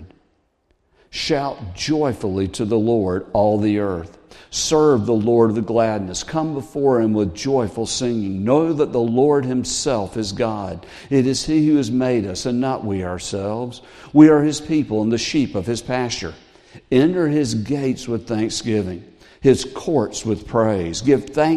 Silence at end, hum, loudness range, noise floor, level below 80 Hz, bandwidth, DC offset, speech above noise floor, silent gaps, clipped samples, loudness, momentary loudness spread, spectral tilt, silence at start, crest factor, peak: 0 s; none; 3 LU; -64 dBFS; -48 dBFS; 12 kHz; under 0.1%; 45 dB; none; under 0.1%; -19 LUFS; 9 LU; -5.5 dB/octave; 0 s; 18 dB; 0 dBFS